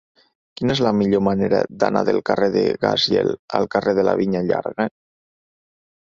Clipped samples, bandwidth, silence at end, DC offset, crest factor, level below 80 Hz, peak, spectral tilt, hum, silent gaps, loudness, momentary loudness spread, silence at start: under 0.1%; 7.6 kHz; 1.25 s; under 0.1%; 18 dB; -52 dBFS; -2 dBFS; -6 dB/octave; none; 3.39-3.48 s; -19 LUFS; 5 LU; 0.6 s